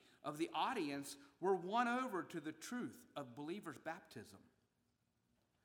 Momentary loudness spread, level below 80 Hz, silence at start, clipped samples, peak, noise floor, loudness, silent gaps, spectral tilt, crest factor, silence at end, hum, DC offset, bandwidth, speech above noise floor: 14 LU; -90 dBFS; 0.25 s; under 0.1%; -24 dBFS; -84 dBFS; -44 LUFS; none; -4.5 dB/octave; 20 dB; 1.25 s; none; under 0.1%; 19.5 kHz; 40 dB